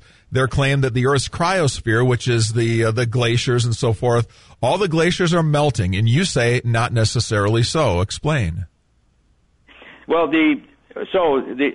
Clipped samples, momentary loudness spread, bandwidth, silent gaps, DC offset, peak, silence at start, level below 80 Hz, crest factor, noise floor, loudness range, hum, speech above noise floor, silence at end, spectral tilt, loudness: under 0.1%; 5 LU; 11 kHz; none; 0.4%; -6 dBFS; 0.3 s; -42 dBFS; 12 dB; -60 dBFS; 4 LU; none; 42 dB; 0 s; -5.5 dB/octave; -18 LUFS